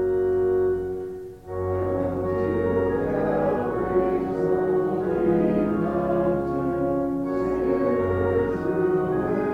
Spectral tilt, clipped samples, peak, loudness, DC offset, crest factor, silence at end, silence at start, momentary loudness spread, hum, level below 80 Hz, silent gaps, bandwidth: -9.5 dB/octave; under 0.1%; -10 dBFS; -24 LUFS; under 0.1%; 14 dB; 0 s; 0 s; 4 LU; none; -46 dBFS; none; 5.2 kHz